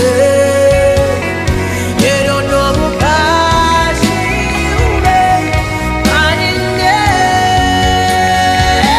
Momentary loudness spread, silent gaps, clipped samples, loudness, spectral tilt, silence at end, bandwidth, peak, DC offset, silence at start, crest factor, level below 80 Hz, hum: 5 LU; none; under 0.1%; -11 LUFS; -4.5 dB/octave; 0 s; 15.5 kHz; 0 dBFS; under 0.1%; 0 s; 10 dB; -22 dBFS; none